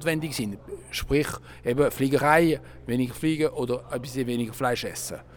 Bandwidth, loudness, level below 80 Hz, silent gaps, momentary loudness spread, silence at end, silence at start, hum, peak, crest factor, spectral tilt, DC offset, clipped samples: 19 kHz; -26 LUFS; -46 dBFS; none; 12 LU; 0 s; 0 s; none; -4 dBFS; 22 dB; -5 dB/octave; under 0.1%; under 0.1%